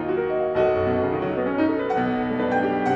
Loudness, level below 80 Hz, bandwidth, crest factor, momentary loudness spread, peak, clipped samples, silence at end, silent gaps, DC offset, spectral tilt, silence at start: -23 LUFS; -50 dBFS; 7.6 kHz; 14 dB; 3 LU; -8 dBFS; under 0.1%; 0 s; none; under 0.1%; -8 dB/octave; 0 s